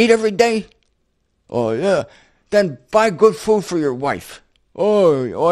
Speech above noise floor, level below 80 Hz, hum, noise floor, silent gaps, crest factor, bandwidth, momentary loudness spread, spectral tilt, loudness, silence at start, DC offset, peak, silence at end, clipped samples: 50 dB; -54 dBFS; none; -66 dBFS; none; 18 dB; 13 kHz; 10 LU; -5.5 dB/octave; -17 LUFS; 0 s; under 0.1%; 0 dBFS; 0 s; under 0.1%